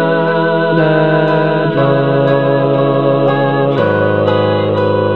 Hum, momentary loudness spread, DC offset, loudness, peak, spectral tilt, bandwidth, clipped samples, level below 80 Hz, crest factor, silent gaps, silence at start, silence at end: none; 2 LU; 1%; -12 LUFS; 0 dBFS; -9.5 dB/octave; 5.2 kHz; under 0.1%; -54 dBFS; 12 dB; none; 0 s; 0 s